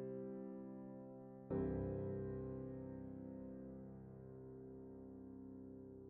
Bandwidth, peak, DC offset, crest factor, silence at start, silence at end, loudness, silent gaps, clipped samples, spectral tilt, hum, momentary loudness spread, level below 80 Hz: 3.4 kHz; -30 dBFS; under 0.1%; 20 dB; 0 s; 0 s; -50 LUFS; none; under 0.1%; -11.5 dB/octave; none; 12 LU; -64 dBFS